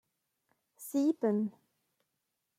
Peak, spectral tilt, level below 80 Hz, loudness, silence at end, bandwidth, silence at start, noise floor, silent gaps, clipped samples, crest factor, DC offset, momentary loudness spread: -20 dBFS; -7 dB/octave; -88 dBFS; -33 LUFS; 1.1 s; 16 kHz; 0.8 s; -84 dBFS; none; under 0.1%; 18 dB; under 0.1%; 11 LU